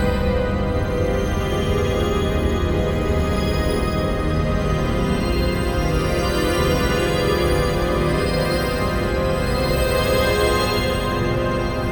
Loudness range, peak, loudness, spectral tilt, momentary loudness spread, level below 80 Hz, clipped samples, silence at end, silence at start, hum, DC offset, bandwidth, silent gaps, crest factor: 1 LU; -6 dBFS; -20 LUFS; -6 dB/octave; 3 LU; -26 dBFS; under 0.1%; 0 s; 0 s; none; under 0.1%; over 20 kHz; none; 14 dB